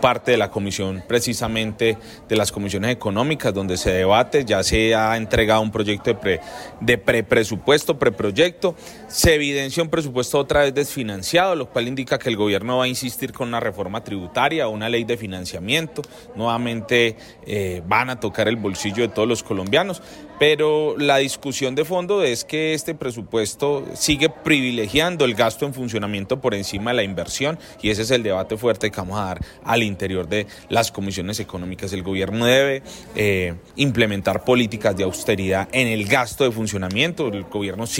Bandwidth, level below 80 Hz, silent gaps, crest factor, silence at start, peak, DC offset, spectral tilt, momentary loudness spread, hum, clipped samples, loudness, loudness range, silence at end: 16.5 kHz; -44 dBFS; none; 16 dB; 0 s; -4 dBFS; under 0.1%; -4 dB/octave; 9 LU; none; under 0.1%; -21 LUFS; 4 LU; 0 s